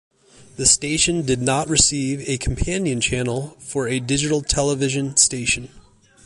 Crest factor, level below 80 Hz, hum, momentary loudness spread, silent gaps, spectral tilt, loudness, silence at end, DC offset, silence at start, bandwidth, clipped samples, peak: 20 dB; -36 dBFS; none; 9 LU; none; -3 dB/octave; -19 LUFS; 0.45 s; under 0.1%; 0.4 s; 11.5 kHz; under 0.1%; 0 dBFS